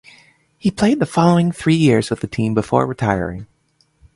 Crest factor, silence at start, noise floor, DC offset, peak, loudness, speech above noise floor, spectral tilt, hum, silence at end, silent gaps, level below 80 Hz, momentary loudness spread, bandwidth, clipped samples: 18 dB; 0.65 s; -61 dBFS; under 0.1%; 0 dBFS; -17 LUFS; 45 dB; -7 dB/octave; none; 0.7 s; none; -46 dBFS; 9 LU; 11.5 kHz; under 0.1%